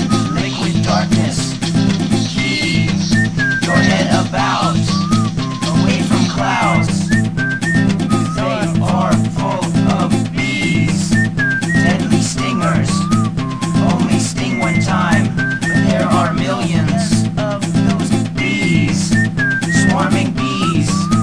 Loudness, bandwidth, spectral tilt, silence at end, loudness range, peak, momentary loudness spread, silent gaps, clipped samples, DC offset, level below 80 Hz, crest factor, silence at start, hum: -15 LUFS; 11 kHz; -5.5 dB/octave; 0 s; 1 LU; 0 dBFS; 3 LU; none; under 0.1%; 1%; -36 dBFS; 14 dB; 0 s; none